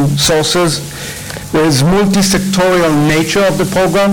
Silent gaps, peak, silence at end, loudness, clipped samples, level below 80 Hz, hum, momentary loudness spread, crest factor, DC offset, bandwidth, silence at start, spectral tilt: none; -4 dBFS; 0 s; -11 LUFS; under 0.1%; -34 dBFS; none; 10 LU; 8 dB; under 0.1%; 19 kHz; 0 s; -4.5 dB/octave